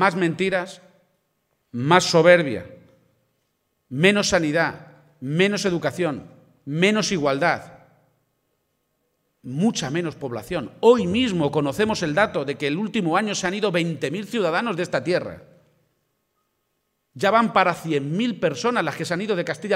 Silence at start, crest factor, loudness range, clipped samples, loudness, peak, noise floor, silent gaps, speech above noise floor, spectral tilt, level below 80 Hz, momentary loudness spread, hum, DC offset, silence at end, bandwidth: 0 s; 22 dB; 5 LU; under 0.1%; -21 LUFS; 0 dBFS; -74 dBFS; none; 53 dB; -5 dB/octave; -58 dBFS; 11 LU; none; under 0.1%; 0 s; 15.5 kHz